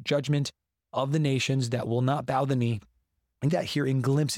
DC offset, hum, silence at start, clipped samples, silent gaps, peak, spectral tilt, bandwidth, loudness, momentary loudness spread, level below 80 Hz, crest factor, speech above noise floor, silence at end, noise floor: under 0.1%; none; 0 s; under 0.1%; none; -14 dBFS; -6 dB/octave; 15 kHz; -28 LUFS; 6 LU; -64 dBFS; 14 dB; 48 dB; 0 s; -74 dBFS